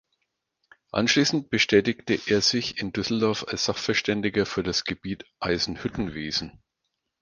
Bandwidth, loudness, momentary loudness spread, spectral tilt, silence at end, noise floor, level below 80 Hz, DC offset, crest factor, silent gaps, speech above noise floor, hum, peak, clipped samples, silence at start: 10 kHz; -25 LUFS; 10 LU; -4 dB/octave; 0.65 s; -80 dBFS; -52 dBFS; under 0.1%; 22 dB; none; 55 dB; none; -4 dBFS; under 0.1%; 0.95 s